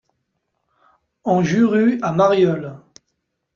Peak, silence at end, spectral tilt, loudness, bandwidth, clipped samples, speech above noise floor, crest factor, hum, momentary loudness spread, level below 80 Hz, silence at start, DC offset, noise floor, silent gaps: -4 dBFS; 0.8 s; -7 dB/octave; -17 LUFS; 7.2 kHz; under 0.1%; 58 dB; 16 dB; none; 13 LU; -60 dBFS; 1.25 s; under 0.1%; -74 dBFS; none